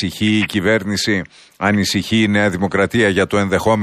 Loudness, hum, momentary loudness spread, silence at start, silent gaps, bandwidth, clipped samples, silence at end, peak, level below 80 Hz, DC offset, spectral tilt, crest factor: -16 LUFS; none; 4 LU; 0 s; none; 15 kHz; under 0.1%; 0 s; -2 dBFS; -46 dBFS; under 0.1%; -5 dB/octave; 14 dB